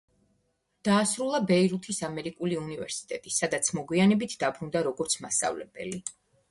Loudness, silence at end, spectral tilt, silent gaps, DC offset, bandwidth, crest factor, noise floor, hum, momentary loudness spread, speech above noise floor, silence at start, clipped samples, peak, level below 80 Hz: -28 LUFS; 0.4 s; -4 dB/octave; none; under 0.1%; 11.5 kHz; 18 dB; -74 dBFS; none; 11 LU; 46 dB; 0.85 s; under 0.1%; -12 dBFS; -66 dBFS